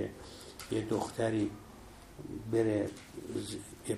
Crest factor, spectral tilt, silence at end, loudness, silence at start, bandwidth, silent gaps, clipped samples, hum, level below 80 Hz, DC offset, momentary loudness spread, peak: 18 dB; -6 dB/octave; 0 s; -35 LUFS; 0 s; 15.5 kHz; none; under 0.1%; none; -60 dBFS; under 0.1%; 18 LU; -18 dBFS